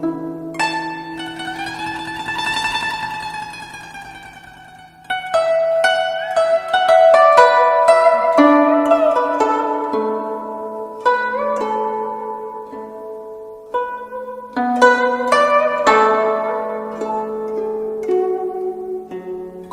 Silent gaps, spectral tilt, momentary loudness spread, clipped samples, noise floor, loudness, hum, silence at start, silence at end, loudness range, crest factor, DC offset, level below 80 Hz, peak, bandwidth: none; -4 dB/octave; 18 LU; under 0.1%; -41 dBFS; -17 LUFS; none; 0 s; 0 s; 11 LU; 18 dB; under 0.1%; -56 dBFS; 0 dBFS; 13.5 kHz